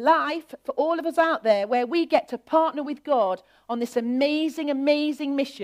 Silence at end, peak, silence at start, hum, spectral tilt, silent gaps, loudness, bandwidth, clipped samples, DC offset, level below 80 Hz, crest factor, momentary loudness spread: 0 s; -6 dBFS; 0 s; none; -4.5 dB/octave; none; -24 LUFS; 15.5 kHz; under 0.1%; under 0.1%; -72 dBFS; 18 dB; 8 LU